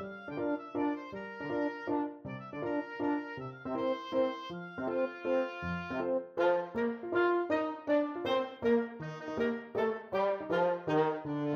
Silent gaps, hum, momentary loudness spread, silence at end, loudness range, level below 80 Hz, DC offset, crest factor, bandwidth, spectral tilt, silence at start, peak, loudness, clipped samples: none; none; 10 LU; 0 s; 4 LU; -68 dBFS; under 0.1%; 16 dB; 7 kHz; -7.5 dB/octave; 0 s; -18 dBFS; -34 LUFS; under 0.1%